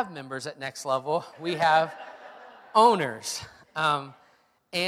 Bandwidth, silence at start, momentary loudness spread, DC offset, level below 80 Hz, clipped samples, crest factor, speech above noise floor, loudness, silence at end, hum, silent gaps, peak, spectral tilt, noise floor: 15.5 kHz; 0 s; 22 LU; under 0.1%; -72 dBFS; under 0.1%; 22 dB; 37 dB; -26 LUFS; 0 s; none; none; -6 dBFS; -3.5 dB/octave; -63 dBFS